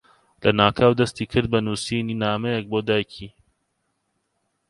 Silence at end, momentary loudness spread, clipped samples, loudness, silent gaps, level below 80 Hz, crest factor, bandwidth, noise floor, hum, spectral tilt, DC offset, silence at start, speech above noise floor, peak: 1.4 s; 8 LU; under 0.1%; -22 LUFS; none; -50 dBFS; 22 dB; 11.5 kHz; -73 dBFS; none; -5.5 dB/octave; under 0.1%; 0.4 s; 52 dB; -2 dBFS